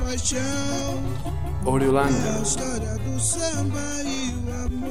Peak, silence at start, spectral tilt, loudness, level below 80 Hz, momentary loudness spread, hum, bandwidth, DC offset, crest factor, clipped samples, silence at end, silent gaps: -8 dBFS; 0 s; -4.5 dB/octave; -25 LUFS; -34 dBFS; 8 LU; none; 16 kHz; 3%; 18 dB; under 0.1%; 0 s; none